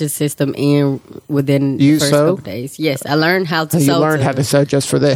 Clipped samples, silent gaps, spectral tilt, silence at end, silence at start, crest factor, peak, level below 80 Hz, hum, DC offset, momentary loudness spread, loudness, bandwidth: under 0.1%; none; -5.5 dB/octave; 0 s; 0 s; 14 dB; 0 dBFS; -54 dBFS; none; under 0.1%; 7 LU; -15 LUFS; 17 kHz